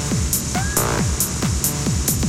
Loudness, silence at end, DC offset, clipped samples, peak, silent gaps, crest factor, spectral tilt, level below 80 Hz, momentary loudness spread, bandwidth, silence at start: -20 LUFS; 0 s; under 0.1%; under 0.1%; -4 dBFS; none; 16 dB; -3.5 dB/octave; -28 dBFS; 1 LU; 17 kHz; 0 s